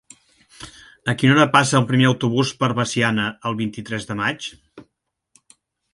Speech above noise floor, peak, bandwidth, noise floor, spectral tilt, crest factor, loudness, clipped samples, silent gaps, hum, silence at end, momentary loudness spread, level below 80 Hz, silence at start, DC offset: 55 dB; 0 dBFS; 11.5 kHz; -74 dBFS; -5 dB/octave; 20 dB; -19 LUFS; under 0.1%; none; none; 1.1 s; 18 LU; -56 dBFS; 0.6 s; under 0.1%